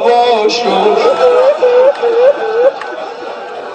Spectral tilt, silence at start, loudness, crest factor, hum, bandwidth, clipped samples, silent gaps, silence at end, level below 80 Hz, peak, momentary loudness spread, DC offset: -3.5 dB/octave; 0 s; -10 LUFS; 10 dB; none; 8.8 kHz; 0.2%; none; 0 s; -62 dBFS; 0 dBFS; 14 LU; under 0.1%